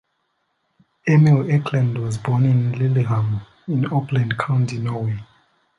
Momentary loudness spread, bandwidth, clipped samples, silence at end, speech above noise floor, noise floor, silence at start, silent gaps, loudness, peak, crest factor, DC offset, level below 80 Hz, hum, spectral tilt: 10 LU; 11 kHz; under 0.1%; 0.55 s; 52 dB; -70 dBFS; 1.05 s; none; -20 LUFS; -4 dBFS; 16 dB; under 0.1%; -54 dBFS; none; -8 dB/octave